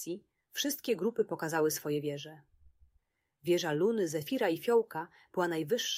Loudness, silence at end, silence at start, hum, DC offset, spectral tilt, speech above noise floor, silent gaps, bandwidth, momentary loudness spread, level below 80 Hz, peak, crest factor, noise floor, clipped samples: -33 LUFS; 0 s; 0 s; none; under 0.1%; -4 dB/octave; 43 dB; none; 16 kHz; 12 LU; -74 dBFS; -18 dBFS; 16 dB; -75 dBFS; under 0.1%